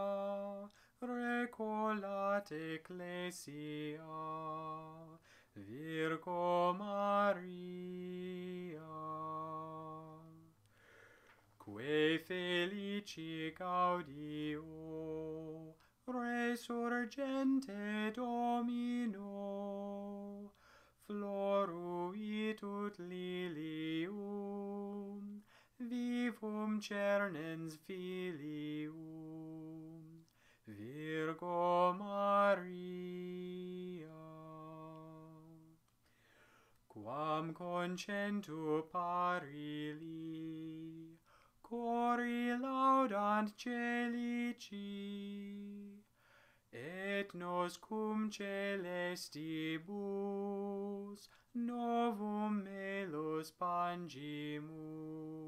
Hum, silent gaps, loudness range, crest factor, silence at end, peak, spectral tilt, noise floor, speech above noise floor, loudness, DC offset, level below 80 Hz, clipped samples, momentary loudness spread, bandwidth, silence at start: none; none; 9 LU; 20 dB; 0 s; -22 dBFS; -6 dB/octave; -74 dBFS; 34 dB; -41 LUFS; under 0.1%; -80 dBFS; under 0.1%; 16 LU; 15.5 kHz; 0 s